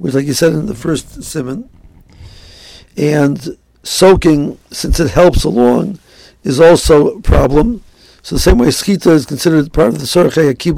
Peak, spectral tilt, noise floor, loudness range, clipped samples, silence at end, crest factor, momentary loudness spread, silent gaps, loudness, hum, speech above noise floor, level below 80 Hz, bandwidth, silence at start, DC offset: 0 dBFS; -5.5 dB/octave; -38 dBFS; 7 LU; 0.3%; 0 s; 12 dB; 15 LU; none; -11 LUFS; none; 27 dB; -22 dBFS; 16.5 kHz; 0 s; under 0.1%